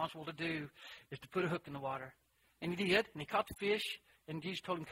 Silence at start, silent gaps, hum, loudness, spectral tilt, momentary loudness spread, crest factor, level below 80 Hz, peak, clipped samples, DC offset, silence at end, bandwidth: 0 s; none; none; -39 LUFS; -5 dB/octave; 16 LU; 24 dB; -68 dBFS; -16 dBFS; under 0.1%; under 0.1%; 0 s; 16 kHz